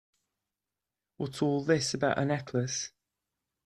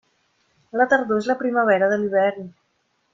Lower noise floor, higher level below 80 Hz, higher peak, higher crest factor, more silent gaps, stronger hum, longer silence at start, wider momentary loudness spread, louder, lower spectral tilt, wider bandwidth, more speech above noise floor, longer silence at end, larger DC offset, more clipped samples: first, -90 dBFS vs -69 dBFS; about the same, -66 dBFS vs -66 dBFS; second, -12 dBFS vs -4 dBFS; about the same, 22 dB vs 18 dB; neither; neither; first, 1.2 s vs 0.75 s; about the same, 11 LU vs 12 LU; second, -30 LUFS vs -20 LUFS; second, -4.5 dB/octave vs -6 dB/octave; first, 13 kHz vs 7.6 kHz; first, 60 dB vs 49 dB; first, 0.8 s vs 0.65 s; neither; neither